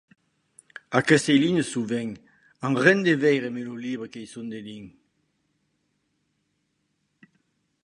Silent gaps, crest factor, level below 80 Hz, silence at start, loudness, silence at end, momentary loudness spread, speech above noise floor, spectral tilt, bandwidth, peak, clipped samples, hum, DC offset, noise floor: none; 24 dB; -68 dBFS; 0.9 s; -23 LUFS; 2.95 s; 19 LU; 51 dB; -5 dB/octave; 11.5 kHz; -2 dBFS; under 0.1%; none; under 0.1%; -74 dBFS